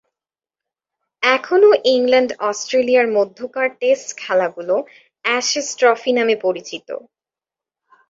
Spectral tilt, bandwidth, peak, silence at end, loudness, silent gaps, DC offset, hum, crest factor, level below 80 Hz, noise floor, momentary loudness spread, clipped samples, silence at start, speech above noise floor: -2 dB/octave; 7.8 kHz; -2 dBFS; 1.1 s; -17 LUFS; none; under 0.1%; none; 16 dB; -68 dBFS; -89 dBFS; 11 LU; under 0.1%; 1.2 s; 72 dB